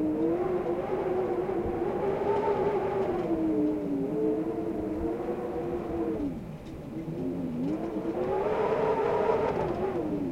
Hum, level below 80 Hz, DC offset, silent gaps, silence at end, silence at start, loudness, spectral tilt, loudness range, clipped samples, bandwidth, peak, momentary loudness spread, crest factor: none; -50 dBFS; under 0.1%; none; 0 s; 0 s; -30 LUFS; -8.5 dB/octave; 4 LU; under 0.1%; 14.5 kHz; -14 dBFS; 6 LU; 16 dB